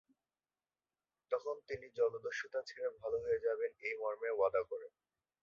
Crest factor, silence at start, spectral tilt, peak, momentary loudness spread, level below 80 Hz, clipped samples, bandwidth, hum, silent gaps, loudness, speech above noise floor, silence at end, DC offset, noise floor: 20 dB; 1.3 s; -1.5 dB/octave; -22 dBFS; 10 LU; -76 dBFS; under 0.1%; 7.2 kHz; none; none; -39 LUFS; over 51 dB; 0.55 s; under 0.1%; under -90 dBFS